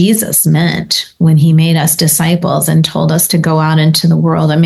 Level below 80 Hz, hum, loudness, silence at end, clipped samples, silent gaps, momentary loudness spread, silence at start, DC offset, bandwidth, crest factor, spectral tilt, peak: -46 dBFS; none; -10 LUFS; 0 s; under 0.1%; none; 3 LU; 0 s; under 0.1%; 13 kHz; 10 dB; -5 dB/octave; 0 dBFS